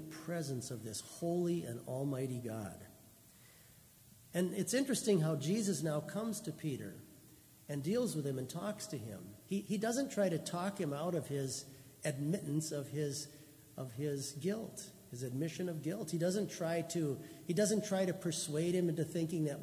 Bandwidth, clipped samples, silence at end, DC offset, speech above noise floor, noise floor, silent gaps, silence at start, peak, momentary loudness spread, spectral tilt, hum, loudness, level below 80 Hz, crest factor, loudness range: 16 kHz; under 0.1%; 0 s; under 0.1%; 24 dB; -62 dBFS; none; 0 s; -20 dBFS; 12 LU; -5.5 dB/octave; none; -38 LUFS; -74 dBFS; 18 dB; 5 LU